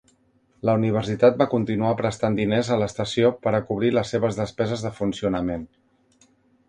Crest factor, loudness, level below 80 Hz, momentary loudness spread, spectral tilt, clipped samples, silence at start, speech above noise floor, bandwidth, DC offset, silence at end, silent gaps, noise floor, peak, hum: 20 dB; -23 LUFS; -52 dBFS; 7 LU; -6.5 dB/octave; under 0.1%; 0.65 s; 40 dB; 10.5 kHz; under 0.1%; 1.05 s; none; -62 dBFS; -4 dBFS; none